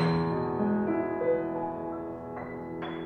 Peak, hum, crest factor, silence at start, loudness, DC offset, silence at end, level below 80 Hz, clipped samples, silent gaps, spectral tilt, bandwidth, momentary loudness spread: -16 dBFS; none; 14 dB; 0 s; -31 LUFS; under 0.1%; 0 s; -58 dBFS; under 0.1%; none; -9 dB/octave; 8.8 kHz; 10 LU